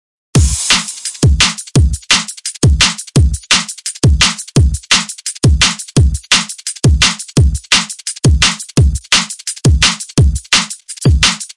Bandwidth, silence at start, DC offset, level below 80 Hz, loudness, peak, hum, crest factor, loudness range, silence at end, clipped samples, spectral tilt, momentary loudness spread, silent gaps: 11.5 kHz; 0.35 s; 0.2%; -18 dBFS; -12 LUFS; 0 dBFS; none; 12 dB; 1 LU; 0.05 s; under 0.1%; -3 dB/octave; 5 LU; none